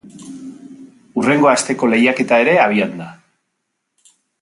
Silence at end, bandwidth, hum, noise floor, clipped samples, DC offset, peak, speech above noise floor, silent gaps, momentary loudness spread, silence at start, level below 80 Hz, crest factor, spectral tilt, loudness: 1.3 s; 11.5 kHz; none; -73 dBFS; under 0.1%; under 0.1%; 0 dBFS; 59 dB; none; 22 LU; 0.05 s; -64 dBFS; 18 dB; -4.5 dB/octave; -14 LUFS